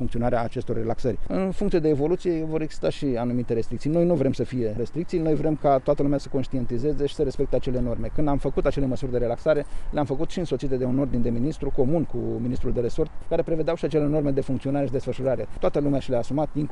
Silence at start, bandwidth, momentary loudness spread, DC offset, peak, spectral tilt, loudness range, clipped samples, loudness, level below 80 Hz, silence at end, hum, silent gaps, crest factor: 0 s; 10 kHz; 6 LU; under 0.1%; -8 dBFS; -8 dB/octave; 2 LU; under 0.1%; -25 LUFS; -34 dBFS; 0 s; none; none; 14 dB